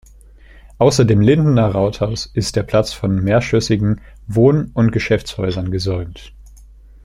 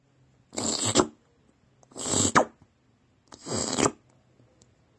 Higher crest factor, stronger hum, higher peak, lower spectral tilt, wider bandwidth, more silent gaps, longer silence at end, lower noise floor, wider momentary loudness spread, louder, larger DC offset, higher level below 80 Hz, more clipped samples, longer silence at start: second, 16 dB vs 26 dB; neither; about the same, -2 dBFS vs -4 dBFS; first, -6.5 dB/octave vs -2.5 dB/octave; first, 12.5 kHz vs 11 kHz; neither; second, 0.55 s vs 1.05 s; second, -43 dBFS vs -65 dBFS; second, 9 LU vs 15 LU; first, -16 LUFS vs -26 LUFS; neither; first, -38 dBFS vs -58 dBFS; neither; first, 0.8 s vs 0.55 s